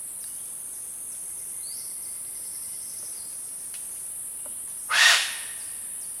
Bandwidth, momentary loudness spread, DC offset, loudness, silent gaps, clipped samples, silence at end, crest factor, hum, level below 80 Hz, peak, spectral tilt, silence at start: over 20 kHz; 15 LU; under 0.1%; -27 LUFS; none; under 0.1%; 0 s; 24 dB; none; -70 dBFS; -6 dBFS; 3 dB/octave; 0 s